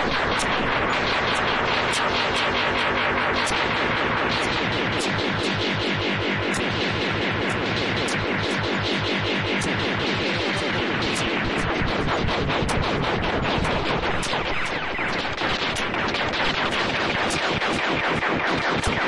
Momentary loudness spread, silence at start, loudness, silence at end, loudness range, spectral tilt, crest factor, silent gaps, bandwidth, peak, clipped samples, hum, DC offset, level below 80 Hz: 2 LU; 0 s; -22 LUFS; 0 s; 2 LU; -4 dB/octave; 14 dB; none; 11.5 kHz; -8 dBFS; under 0.1%; none; under 0.1%; -40 dBFS